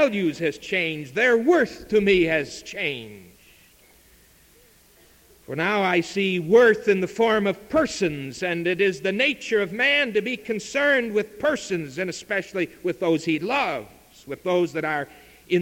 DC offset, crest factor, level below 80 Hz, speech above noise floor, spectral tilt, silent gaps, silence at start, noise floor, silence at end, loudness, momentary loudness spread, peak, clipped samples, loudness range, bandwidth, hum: under 0.1%; 18 dB; -56 dBFS; 32 dB; -5 dB/octave; none; 0 s; -55 dBFS; 0 s; -23 LUFS; 10 LU; -4 dBFS; under 0.1%; 6 LU; 17 kHz; none